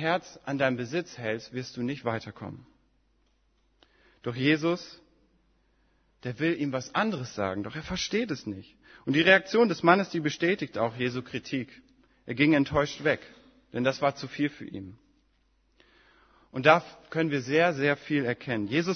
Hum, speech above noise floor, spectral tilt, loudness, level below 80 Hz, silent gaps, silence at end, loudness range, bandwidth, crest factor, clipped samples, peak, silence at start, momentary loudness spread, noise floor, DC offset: none; 41 dB; -5.5 dB/octave; -27 LUFS; -60 dBFS; none; 0 s; 8 LU; 6.6 kHz; 26 dB; under 0.1%; -4 dBFS; 0 s; 17 LU; -69 dBFS; under 0.1%